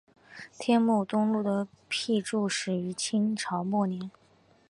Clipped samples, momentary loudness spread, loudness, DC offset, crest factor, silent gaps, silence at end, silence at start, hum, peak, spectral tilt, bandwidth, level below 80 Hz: under 0.1%; 10 LU; -29 LUFS; under 0.1%; 18 dB; none; 0.6 s; 0.3 s; none; -12 dBFS; -5 dB/octave; 11 kHz; -74 dBFS